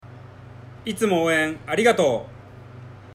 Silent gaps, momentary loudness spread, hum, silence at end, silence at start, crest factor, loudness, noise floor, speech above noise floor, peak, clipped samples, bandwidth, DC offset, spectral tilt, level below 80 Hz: none; 25 LU; none; 0.05 s; 0.05 s; 20 dB; -21 LUFS; -42 dBFS; 21 dB; -4 dBFS; under 0.1%; 16 kHz; under 0.1%; -4.5 dB/octave; -56 dBFS